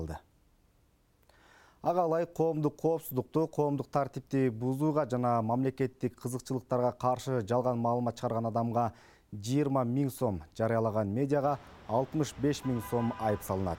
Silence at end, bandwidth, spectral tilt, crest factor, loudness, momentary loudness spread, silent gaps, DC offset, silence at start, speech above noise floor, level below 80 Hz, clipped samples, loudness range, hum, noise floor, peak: 0 s; 17 kHz; -7.5 dB/octave; 16 dB; -32 LUFS; 5 LU; none; under 0.1%; 0 s; 37 dB; -60 dBFS; under 0.1%; 1 LU; none; -68 dBFS; -14 dBFS